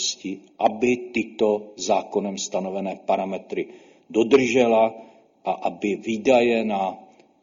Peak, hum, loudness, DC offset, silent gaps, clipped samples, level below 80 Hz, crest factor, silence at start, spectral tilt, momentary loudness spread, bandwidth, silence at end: -4 dBFS; none; -23 LUFS; under 0.1%; none; under 0.1%; -64 dBFS; 20 dB; 0 s; -4 dB/octave; 12 LU; 7.6 kHz; 0.4 s